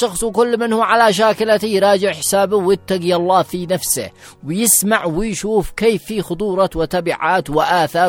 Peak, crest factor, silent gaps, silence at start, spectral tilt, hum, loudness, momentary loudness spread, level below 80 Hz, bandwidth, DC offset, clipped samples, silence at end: 0 dBFS; 16 dB; none; 0 s; -3.5 dB/octave; none; -16 LUFS; 8 LU; -40 dBFS; 18 kHz; under 0.1%; under 0.1%; 0 s